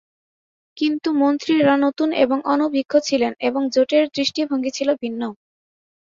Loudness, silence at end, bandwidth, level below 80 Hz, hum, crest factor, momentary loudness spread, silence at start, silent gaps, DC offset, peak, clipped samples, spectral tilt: -19 LUFS; 0.8 s; 7.6 kHz; -66 dBFS; none; 18 dB; 6 LU; 0.75 s; none; under 0.1%; -2 dBFS; under 0.1%; -4 dB/octave